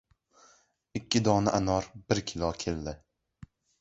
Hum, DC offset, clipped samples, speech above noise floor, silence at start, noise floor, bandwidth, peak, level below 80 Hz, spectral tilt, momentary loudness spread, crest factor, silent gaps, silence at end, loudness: none; under 0.1%; under 0.1%; 35 dB; 0.95 s; -64 dBFS; 8.2 kHz; -10 dBFS; -50 dBFS; -5 dB/octave; 15 LU; 22 dB; none; 0.85 s; -30 LUFS